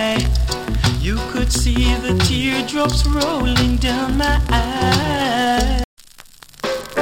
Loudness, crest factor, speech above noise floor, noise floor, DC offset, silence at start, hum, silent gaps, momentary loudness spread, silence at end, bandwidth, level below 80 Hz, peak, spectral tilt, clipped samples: -18 LUFS; 14 dB; 26 dB; -42 dBFS; under 0.1%; 0 s; none; 5.84-5.97 s; 5 LU; 0 s; 17 kHz; -22 dBFS; -2 dBFS; -4.5 dB/octave; under 0.1%